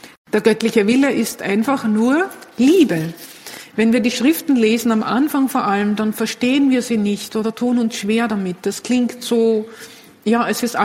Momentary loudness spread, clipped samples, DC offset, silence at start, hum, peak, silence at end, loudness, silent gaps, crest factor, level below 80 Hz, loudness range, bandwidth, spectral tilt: 8 LU; under 0.1%; under 0.1%; 0.05 s; none; 0 dBFS; 0 s; -17 LUFS; 0.17-0.25 s; 16 dB; -60 dBFS; 3 LU; 16.5 kHz; -5 dB/octave